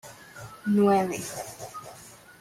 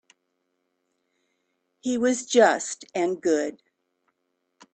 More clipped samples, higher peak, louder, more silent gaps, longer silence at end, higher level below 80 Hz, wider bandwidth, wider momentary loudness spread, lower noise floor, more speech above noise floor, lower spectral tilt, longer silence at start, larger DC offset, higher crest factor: neither; second, -12 dBFS vs -4 dBFS; about the same, -26 LUFS vs -24 LUFS; neither; second, 0.25 s vs 1.2 s; first, -66 dBFS vs -72 dBFS; first, 16 kHz vs 9.2 kHz; first, 23 LU vs 12 LU; second, -49 dBFS vs -76 dBFS; second, 24 dB vs 53 dB; first, -6 dB/octave vs -3 dB/octave; second, 0.05 s vs 1.85 s; neither; second, 16 dB vs 22 dB